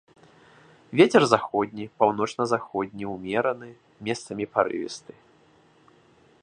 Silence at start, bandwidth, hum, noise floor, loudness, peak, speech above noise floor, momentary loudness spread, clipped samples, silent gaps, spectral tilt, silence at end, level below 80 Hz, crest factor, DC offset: 0.9 s; 10.5 kHz; none; -58 dBFS; -25 LUFS; -2 dBFS; 34 dB; 17 LU; under 0.1%; none; -5 dB/octave; 1.45 s; -66 dBFS; 24 dB; under 0.1%